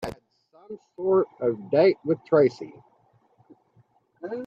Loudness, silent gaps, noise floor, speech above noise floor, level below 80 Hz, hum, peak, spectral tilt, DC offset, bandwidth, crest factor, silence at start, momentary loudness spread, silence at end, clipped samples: -23 LUFS; none; -63 dBFS; 40 dB; -62 dBFS; none; -8 dBFS; -8 dB/octave; under 0.1%; 8.4 kHz; 18 dB; 0 s; 22 LU; 0 s; under 0.1%